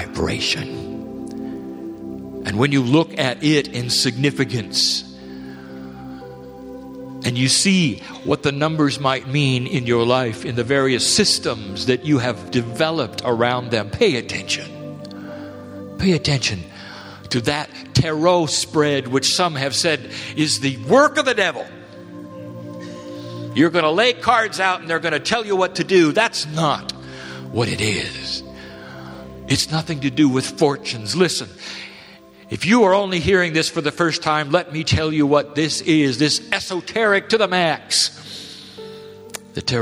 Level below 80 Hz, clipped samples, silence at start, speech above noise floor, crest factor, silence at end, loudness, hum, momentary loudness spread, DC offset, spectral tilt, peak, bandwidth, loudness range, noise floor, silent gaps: -48 dBFS; under 0.1%; 0 s; 25 dB; 20 dB; 0 s; -18 LUFS; none; 19 LU; under 0.1%; -4 dB/octave; 0 dBFS; 15.5 kHz; 4 LU; -44 dBFS; none